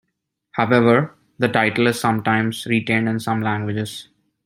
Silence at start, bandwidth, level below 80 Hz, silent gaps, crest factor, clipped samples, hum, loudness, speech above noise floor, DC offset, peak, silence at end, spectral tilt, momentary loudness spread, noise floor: 0.55 s; 16 kHz; -58 dBFS; none; 18 dB; under 0.1%; none; -19 LUFS; 58 dB; under 0.1%; -2 dBFS; 0.4 s; -6 dB/octave; 12 LU; -76 dBFS